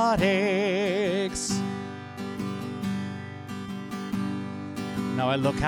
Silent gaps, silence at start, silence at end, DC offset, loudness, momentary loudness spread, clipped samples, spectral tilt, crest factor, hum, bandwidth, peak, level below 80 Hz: none; 0 s; 0 s; under 0.1%; -29 LUFS; 12 LU; under 0.1%; -5 dB/octave; 16 dB; 50 Hz at -60 dBFS; 18 kHz; -10 dBFS; -50 dBFS